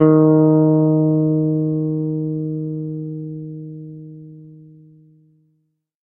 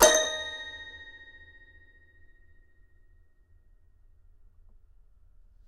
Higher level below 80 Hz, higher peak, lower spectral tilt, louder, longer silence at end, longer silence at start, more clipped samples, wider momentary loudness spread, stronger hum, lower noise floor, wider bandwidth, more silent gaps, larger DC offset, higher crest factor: about the same, -60 dBFS vs -56 dBFS; about the same, 0 dBFS vs -2 dBFS; first, -15 dB/octave vs 0 dB/octave; first, -17 LUFS vs -28 LUFS; second, 1.5 s vs 4.6 s; about the same, 0 s vs 0 s; neither; second, 22 LU vs 29 LU; neither; first, -68 dBFS vs -59 dBFS; second, 2.2 kHz vs 13.5 kHz; neither; neither; second, 18 dB vs 30 dB